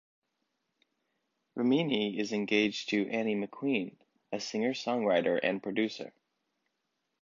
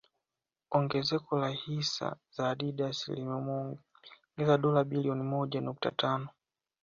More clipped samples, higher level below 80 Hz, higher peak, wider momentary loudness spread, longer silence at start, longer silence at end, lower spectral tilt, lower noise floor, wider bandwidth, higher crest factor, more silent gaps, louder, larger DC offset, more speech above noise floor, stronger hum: neither; second, -78 dBFS vs -72 dBFS; about the same, -14 dBFS vs -12 dBFS; about the same, 11 LU vs 9 LU; first, 1.55 s vs 0.7 s; first, 1.15 s vs 0.55 s; about the same, -5 dB/octave vs -6 dB/octave; second, -82 dBFS vs under -90 dBFS; about the same, 7.6 kHz vs 7.4 kHz; about the same, 20 dB vs 20 dB; neither; about the same, -31 LUFS vs -32 LUFS; neither; second, 52 dB vs over 58 dB; neither